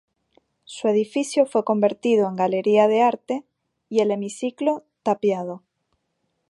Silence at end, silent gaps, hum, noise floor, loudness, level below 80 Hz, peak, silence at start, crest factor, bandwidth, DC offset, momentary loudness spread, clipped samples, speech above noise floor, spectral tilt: 0.9 s; none; none; -74 dBFS; -22 LUFS; -76 dBFS; -4 dBFS; 0.7 s; 18 dB; 11.5 kHz; under 0.1%; 11 LU; under 0.1%; 53 dB; -5.5 dB/octave